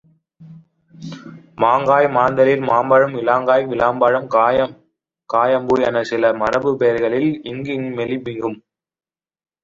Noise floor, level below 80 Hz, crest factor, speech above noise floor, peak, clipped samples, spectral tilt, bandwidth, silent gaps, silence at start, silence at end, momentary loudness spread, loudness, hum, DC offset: under -90 dBFS; -54 dBFS; 16 dB; over 74 dB; -2 dBFS; under 0.1%; -7 dB/octave; 7.4 kHz; none; 0.4 s; 1.1 s; 12 LU; -17 LUFS; none; under 0.1%